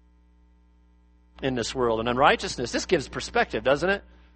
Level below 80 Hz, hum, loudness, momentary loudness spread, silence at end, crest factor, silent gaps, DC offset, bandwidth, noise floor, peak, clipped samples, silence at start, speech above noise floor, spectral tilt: -48 dBFS; 60 Hz at -45 dBFS; -25 LUFS; 8 LU; 0.35 s; 22 dB; none; under 0.1%; 8.8 kHz; -58 dBFS; -4 dBFS; under 0.1%; 1.4 s; 33 dB; -4 dB/octave